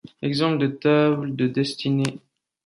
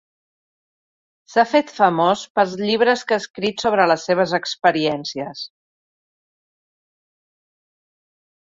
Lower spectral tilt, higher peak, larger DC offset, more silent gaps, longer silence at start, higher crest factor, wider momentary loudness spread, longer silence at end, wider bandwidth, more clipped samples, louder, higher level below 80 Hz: first, -6.5 dB/octave vs -4.5 dB/octave; second, -6 dBFS vs -2 dBFS; neither; second, none vs 2.30-2.35 s, 3.30-3.34 s; second, 0.2 s vs 1.3 s; about the same, 16 dB vs 20 dB; second, 6 LU vs 11 LU; second, 0.5 s vs 3 s; first, 11.5 kHz vs 7.8 kHz; neither; second, -22 LUFS vs -19 LUFS; about the same, -64 dBFS vs -64 dBFS